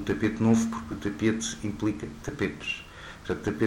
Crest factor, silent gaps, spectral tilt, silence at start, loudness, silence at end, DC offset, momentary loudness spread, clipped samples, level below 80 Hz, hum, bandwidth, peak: 18 dB; none; -5.5 dB/octave; 0 s; -29 LUFS; 0 s; under 0.1%; 12 LU; under 0.1%; -50 dBFS; none; 12.5 kHz; -10 dBFS